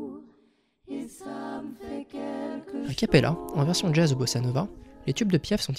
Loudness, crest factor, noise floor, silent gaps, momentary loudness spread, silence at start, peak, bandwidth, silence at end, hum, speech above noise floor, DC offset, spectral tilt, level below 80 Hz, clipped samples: -27 LUFS; 22 dB; -65 dBFS; none; 15 LU; 0 s; -6 dBFS; 15.5 kHz; 0 s; none; 40 dB; under 0.1%; -5.5 dB/octave; -50 dBFS; under 0.1%